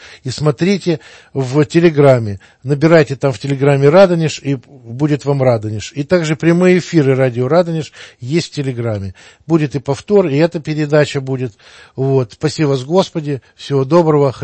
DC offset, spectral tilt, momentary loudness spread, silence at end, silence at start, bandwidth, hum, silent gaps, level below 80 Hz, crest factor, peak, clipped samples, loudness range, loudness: under 0.1%; -7 dB/octave; 13 LU; 0 s; 0 s; 8.8 kHz; none; none; -52 dBFS; 14 dB; 0 dBFS; under 0.1%; 5 LU; -14 LUFS